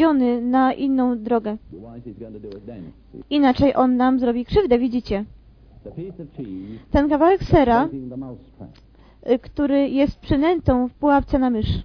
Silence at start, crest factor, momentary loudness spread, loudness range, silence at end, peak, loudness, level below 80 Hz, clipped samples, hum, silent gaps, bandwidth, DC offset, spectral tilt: 0 s; 18 dB; 20 LU; 2 LU; 0 s; -2 dBFS; -19 LUFS; -36 dBFS; under 0.1%; none; none; 5.4 kHz; under 0.1%; -9 dB/octave